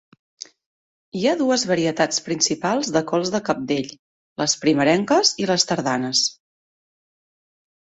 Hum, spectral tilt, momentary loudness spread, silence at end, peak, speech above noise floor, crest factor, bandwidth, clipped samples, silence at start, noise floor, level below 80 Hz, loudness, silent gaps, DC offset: none; -3 dB/octave; 16 LU; 1.6 s; -2 dBFS; over 70 dB; 20 dB; 8.4 kHz; under 0.1%; 1.15 s; under -90 dBFS; -62 dBFS; -20 LUFS; 3.99-4.36 s; under 0.1%